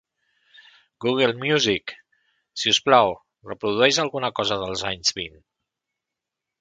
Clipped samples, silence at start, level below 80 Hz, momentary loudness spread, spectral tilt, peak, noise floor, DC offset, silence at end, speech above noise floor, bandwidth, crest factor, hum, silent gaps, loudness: under 0.1%; 1 s; -58 dBFS; 17 LU; -3 dB/octave; 0 dBFS; -85 dBFS; under 0.1%; 1.3 s; 64 dB; 9.4 kHz; 24 dB; none; none; -21 LUFS